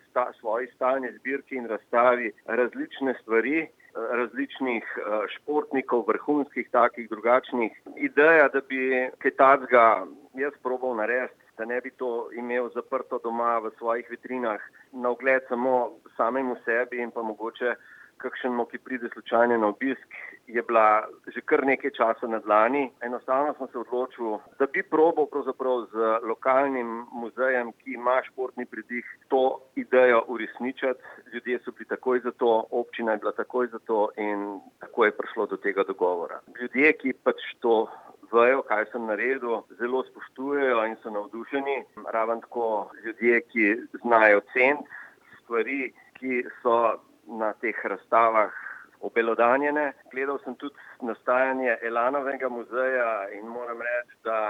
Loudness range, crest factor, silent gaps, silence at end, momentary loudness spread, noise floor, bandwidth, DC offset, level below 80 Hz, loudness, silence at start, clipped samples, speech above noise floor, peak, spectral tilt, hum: 5 LU; 22 dB; none; 0 s; 14 LU; -50 dBFS; 6.2 kHz; under 0.1%; -84 dBFS; -26 LUFS; 0.15 s; under 0.1%; 24 dB; -4 dBFS; -6.5 dB/octave; none